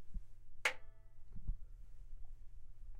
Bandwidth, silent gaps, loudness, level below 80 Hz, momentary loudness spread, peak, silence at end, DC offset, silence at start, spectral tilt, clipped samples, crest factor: 14 kHz; none; -44 LUFS; -50 dBFS; 25 LU; -20 dBFS; 0 s; under 0.1%; 0 s; -2.5 dB/octave; under 0.1%; 24 dB